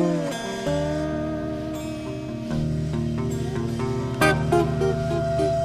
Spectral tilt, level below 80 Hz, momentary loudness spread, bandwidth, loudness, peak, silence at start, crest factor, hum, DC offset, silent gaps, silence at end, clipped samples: -6.5 dB/octave; -40 dBFS; 9 LU; 14 kHz; -25 LUFS; -6 dBFS; 0 s; 18 dB; none; under 0.1%; none; 0 s; under 0.1%